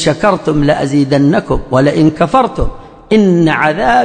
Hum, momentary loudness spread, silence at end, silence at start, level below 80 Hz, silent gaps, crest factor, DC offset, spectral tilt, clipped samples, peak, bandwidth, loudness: none; 5 LU; 0 s; 0 s; -28 dBFS; none; 10 dB; under 0.1%; -6.5 dB/octave; under 0.1%; 0 dBFS; 9.6 kHz; -11 LUFS